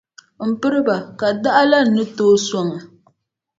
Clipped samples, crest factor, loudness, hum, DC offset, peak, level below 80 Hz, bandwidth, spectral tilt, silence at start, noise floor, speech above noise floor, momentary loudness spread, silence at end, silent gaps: under 0.1%; 18 dB; -17 LUFS; none; under 0.1%; 0 dBFS; -64 dBFS; 7.8 kHz; -4.5 dB/octave; 0.4 s; -63 dBFS; 46 dB; 11 LU; 0.75 s; none